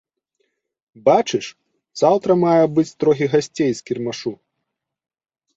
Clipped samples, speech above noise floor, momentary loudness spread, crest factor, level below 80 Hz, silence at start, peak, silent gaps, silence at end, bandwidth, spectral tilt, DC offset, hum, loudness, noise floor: under 0.1%; 61 dB; 12 LU; 18 dB; -62 dBFS; 1.05 s; -2 dBFS; none; 1.25 s; 8 kHz; -6 dB/octave; under 0.1%; none; -18 LUFS; -79 dBFS